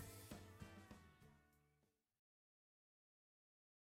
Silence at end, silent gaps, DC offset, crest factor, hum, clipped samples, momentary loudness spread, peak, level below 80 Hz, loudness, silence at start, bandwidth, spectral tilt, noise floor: 1.9 s; none; under 0.1%; 24 dB; none; under 0.1%; 8 LU; -42 dBFS; -76 dBFS; -61 LUFS; 0 s; 16 kHz; -4.5 dB/octave; -85 dBFS